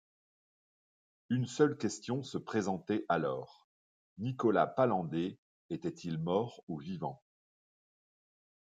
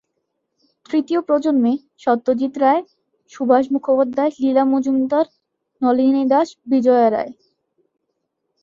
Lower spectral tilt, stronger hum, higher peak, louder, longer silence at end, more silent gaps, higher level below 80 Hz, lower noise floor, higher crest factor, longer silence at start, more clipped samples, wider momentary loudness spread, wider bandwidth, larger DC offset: about the same, -6.5 dB/octave vs -6.5 dB/octave; neither; second, -14 dBFS vs -2 dBFS; second, -35 LUFS vs -18 LUFS; first, 1.55 s vs 1.3 s; first, 3.64-4.16 s, 5.38-5.69 s, 6.63-6.67 s vs none; second, -76 dBFS vs -66 dBFS; first, under -90 dBFS vs -74 dBFS; first, 22 dB vs 16 dB; first, 1.3 s vs 0.9 s; neither; first, 12 LU vs 7 LU; first, 9.4 kHz vs 7.4 kHz; neither